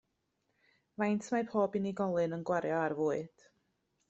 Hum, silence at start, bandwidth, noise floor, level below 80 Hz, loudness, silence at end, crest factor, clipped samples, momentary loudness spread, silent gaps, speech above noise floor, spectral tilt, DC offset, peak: none; 1 s; 8.2 kHz; -81 dBFS; -76 dBFS; -34 LUFS; 0.8 s; 18 dB; under 0.1%; 6 LU; none; 47 dB; -7 dB/octave; under 0.1%; -18 dBFS